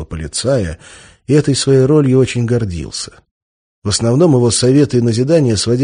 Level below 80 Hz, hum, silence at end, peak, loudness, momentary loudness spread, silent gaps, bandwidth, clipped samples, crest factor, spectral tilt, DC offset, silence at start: -38 dBFS; none; 0 s; 0 dBFS; -13 LUFS; 14 LU; 3.31-3.82 s; 10 kHz; under 0.1%; 12 dB; -5.5 dB/octave; under 0.1%; 0 s